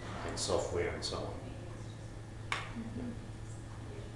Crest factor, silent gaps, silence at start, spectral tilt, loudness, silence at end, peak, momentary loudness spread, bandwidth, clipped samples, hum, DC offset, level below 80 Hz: 22 dB; none; 0 s; -4.5 dB/octave; -40 LUFS; 0 s; -18 dBFS; 12 LU; 12 kHz; under 0.1%; none; under 0.1%; -52 dBFS